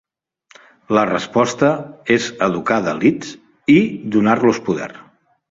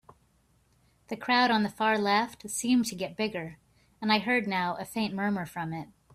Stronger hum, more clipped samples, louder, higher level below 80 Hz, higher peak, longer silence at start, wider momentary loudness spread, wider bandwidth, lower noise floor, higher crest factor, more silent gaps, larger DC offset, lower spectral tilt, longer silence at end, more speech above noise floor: neither; neither; first, -17 LUFS vs -28 LUFS; first, -56 dBFS vs -66 dBFS; first, -2 dBFS vs -12 dBFS; second, 0.9 s vs 1.1 s; second, 10 LU vs 13 LU; second, 7.8 kHz vs 15 kHz; second, -55 dBFS vs -67 dBFS; about the same, 16 dB vs 18 dB; neither; neither; first, -5.5 dB/octave vs -4 dB/octave; first, 0.5 s vs 0.3 s; about the same, 39 dB vs 38 dB